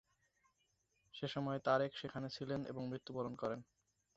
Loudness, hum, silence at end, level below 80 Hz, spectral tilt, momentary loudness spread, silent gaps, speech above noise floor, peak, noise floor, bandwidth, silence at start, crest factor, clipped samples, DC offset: -42 LUFS; none; 0.55 s; -76 dBFS; -4.5 dB/octave; 10 LU; none; 40 dB; -22 dBFS; -82 dBFS; 8 kHz; 1.15 s; 22 dB; under 0.1%; under 0.1%